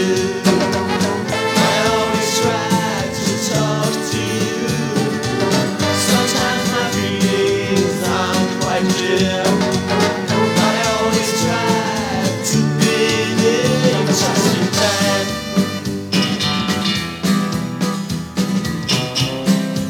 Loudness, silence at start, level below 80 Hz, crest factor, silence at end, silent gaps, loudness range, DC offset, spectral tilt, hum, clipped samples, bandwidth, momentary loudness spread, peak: -17 LUFS; 0 s; -46 dBFS; 16 dB; 0 s; none; 3 LU; under 0.1%; -4 dB/octave; none; under 0.1%; 18.5 kHz; 5 LU; 0 dBFS